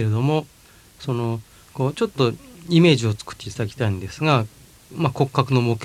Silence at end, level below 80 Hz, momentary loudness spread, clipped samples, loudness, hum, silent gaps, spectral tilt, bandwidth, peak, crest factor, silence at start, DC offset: 0 s; -54 dBFS; 16 LU; under 0.1%; -22 LUFS; none; none; -6.5 dB/octave; 15 kHz; -2 dBFS; 20 dB; 0 s; under 0.1%